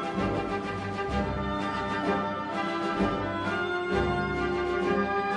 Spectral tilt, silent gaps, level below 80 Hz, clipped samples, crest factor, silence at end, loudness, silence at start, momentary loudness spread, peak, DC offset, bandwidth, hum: -6.5 dB/octave; none; -44 dBFS; under 0.1%; 16 dB; 0 s; -29 LUFS; 0 s; 4 LU; -12 dBFS; under 0.1%; 10.5 kHz; none